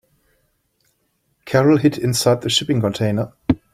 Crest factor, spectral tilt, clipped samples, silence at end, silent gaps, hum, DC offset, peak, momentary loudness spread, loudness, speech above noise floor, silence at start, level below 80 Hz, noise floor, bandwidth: 18 dB; -5 dB/octave; under 0.1%; 0.2 s; none; none; under 0.1%; -2 dBFS; 7 LU; -18 LUFS; 50 dB; 1.45 s; -48 dBFS; -67 dBFS; 16 kHz